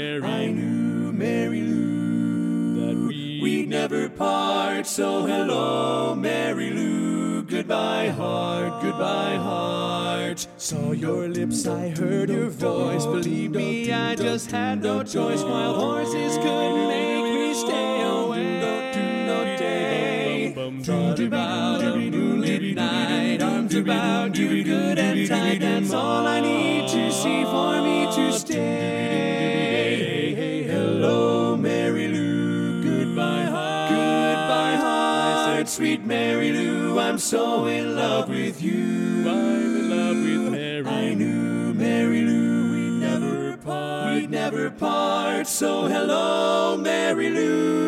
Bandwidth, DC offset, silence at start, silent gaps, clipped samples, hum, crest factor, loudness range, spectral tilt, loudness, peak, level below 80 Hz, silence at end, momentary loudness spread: 16 kHz; under 0.1%; 0 s; none; under 0.1%; none; 14 dB; 3 LU; -5 dB/octave; -23 LUFS; -8 dBFS; -64 dBFS; 0 s; 4 LU